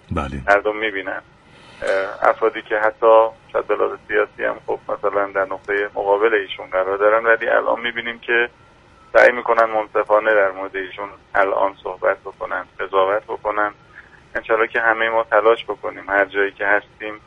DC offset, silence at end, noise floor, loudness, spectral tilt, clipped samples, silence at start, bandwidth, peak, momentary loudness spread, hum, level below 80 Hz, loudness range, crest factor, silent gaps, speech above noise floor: under 0.1%; 0.1 s; -49 dBFS; -19 LUFS; -5.5 dB/octave; under 0.1%; 0.1 s; 9.4 kHz; 0 dBFS; 12 LU; none; -48 dBFS; 4 LU; 20 dB; none; 30 dB